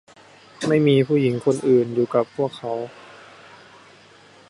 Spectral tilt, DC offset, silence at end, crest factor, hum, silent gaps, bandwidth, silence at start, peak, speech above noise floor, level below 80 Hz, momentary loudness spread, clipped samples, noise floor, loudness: -7 dB/octave; under 0.1%; 1.5 s; 18 dB; none; none; 11.5 kHz; 0.6 s; -6 dBFS; 30 dB; -66 dBFS; 12 LU; under 0.1%; -50 dBFS; -20 LUFS